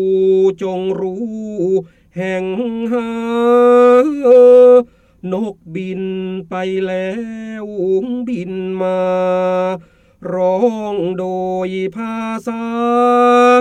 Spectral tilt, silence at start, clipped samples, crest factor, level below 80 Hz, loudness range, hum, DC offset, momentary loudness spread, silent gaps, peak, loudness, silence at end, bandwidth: -7 dB/octave; 0 s; under 0.1%; 14 dB; -56 dBFS; 10 LU; none; under 0.1%; 15 LU; none; -2 dBFS; -15 LUFS; 0 s; 9 kHz